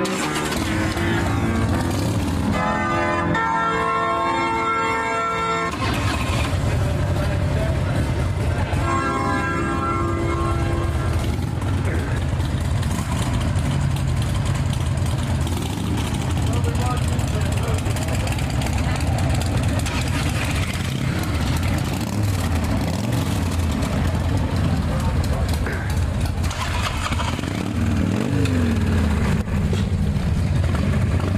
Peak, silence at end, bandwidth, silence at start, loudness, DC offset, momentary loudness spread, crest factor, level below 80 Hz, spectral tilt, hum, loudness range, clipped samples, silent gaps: -8 dBFS; 0 s; 15.5 kHz; 0 s; -22 LUFS; under 0.1%; 3 LU; 14 dB; -30 dBFS; -6 dB/octave; none; 2 LU; under 0.1%; none